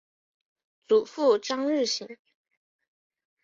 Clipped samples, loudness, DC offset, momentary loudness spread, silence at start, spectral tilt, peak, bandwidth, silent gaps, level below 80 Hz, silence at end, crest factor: under 0.1%; -26 LUFS; under 0.1%; 7 LU; 0.9 s; -2.5 dB/octave; -12 dBFS; 7.8 kHz; none; -78 dBFS; 1.3 s; 18 dB